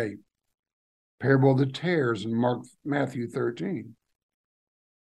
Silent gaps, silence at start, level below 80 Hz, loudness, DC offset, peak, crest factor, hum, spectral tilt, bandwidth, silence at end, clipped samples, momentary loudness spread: 0.59-0.63 s, 0.73-1.18 s; 0 s; -72 dBFS; -27 LUFS; under 0.1%; -8 dBFS; 20 dB; none; -8 dB/octave; 9.8 kHz; 1.2 s; under 0.1%; 12 LU